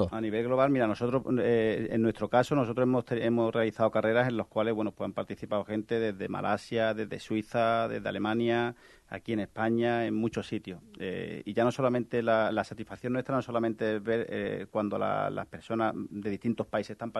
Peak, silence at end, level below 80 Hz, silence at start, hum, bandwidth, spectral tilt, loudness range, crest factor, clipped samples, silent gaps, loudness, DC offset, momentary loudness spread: -12 dBFS; 0 s; -62 dBFS; 0 s; none; 12 kHz; -7 dB/octave; 4 LU; 18 dB; under 0.1%; none; -30 LUFS; under 0.1%; 9 LU